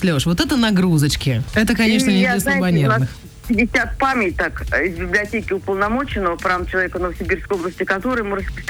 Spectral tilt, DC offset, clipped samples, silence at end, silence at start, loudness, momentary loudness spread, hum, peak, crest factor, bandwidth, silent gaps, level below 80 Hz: -5.5 dB/octave; under 0.1%; under 0.1%; 0 s; 0 s; -18 LUFS; 7 LU; none; -6 dBFS; 12 dB; over 20 kHz; none; -34 dBFS